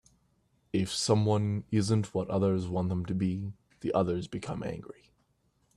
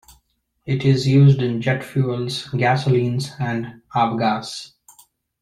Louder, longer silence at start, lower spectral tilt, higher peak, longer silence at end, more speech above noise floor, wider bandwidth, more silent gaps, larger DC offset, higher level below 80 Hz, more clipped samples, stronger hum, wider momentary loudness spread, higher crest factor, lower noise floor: second, -31 LUFS vs -19 LUFS; about the same, 0.75 s vs 0.65 s; about the same, -6.5 dB/octave vs -7 dB/octave; second, -12 dBFS vs -4 dBFS; about the same, 0.85 s vs 0.75 s; second, 42 dB vs 47 dB; about the same, 12.5 kHz vs 12 kHz; neither; neither; second, -60 dBFS vs -54 dBFS; neither; neither; about the same, 12 LU vs 13 LU; about the same, 20 dB vs 16 dB; first, -72 dBFS vs -66 dBFS